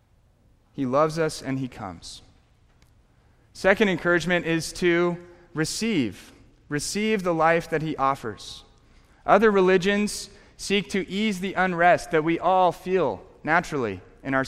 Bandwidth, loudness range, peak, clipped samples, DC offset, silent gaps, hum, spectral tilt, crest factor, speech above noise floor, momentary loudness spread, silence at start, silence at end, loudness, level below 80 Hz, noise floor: 16 kHz; 4 LU; -4 dBFS; under 0.1%; under 0.1%; none; none; -5 dB/octave; 20 dB; 37 dB; 17 LU; 0.75 s; 0 s; -23 LUFS; -52 dBFS; -60 dBFS